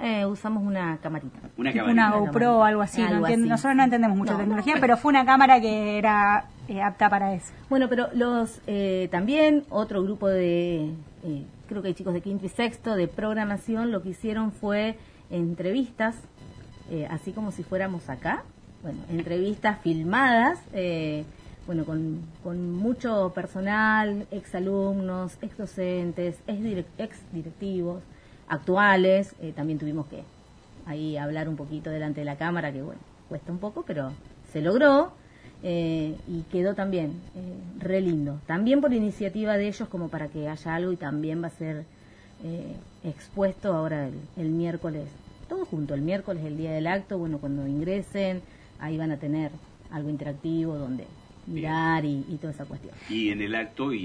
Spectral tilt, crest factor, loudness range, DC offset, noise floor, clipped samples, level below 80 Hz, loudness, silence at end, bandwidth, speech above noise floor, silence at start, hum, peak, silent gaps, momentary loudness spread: -7 dB/octave; 24 dB; 11 LU; under 0.1%; -50 dBFS; under 0.1%; -54 dBFS; -26 LUFS; 0 s; 10.5 kHz; 24 dB; 0 s; none; -4 dBFS; none; 16 LU